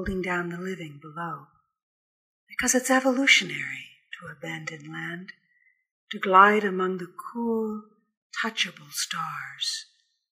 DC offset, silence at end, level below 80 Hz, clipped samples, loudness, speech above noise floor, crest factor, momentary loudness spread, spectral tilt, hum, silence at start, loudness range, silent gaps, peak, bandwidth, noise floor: under 0.1%; 0.5 s; -56 dBFS; under 0.1%; -25 LUFS; 40 dB; 24 dB; 20 LU; -2.5 dB/octave; none; 0 s; 5 LU; 1.83-2.47 s, 5.91-6.07 s, 8.17-8.30 s; -4 dBFS; 15.5 kHz; -67 dBFS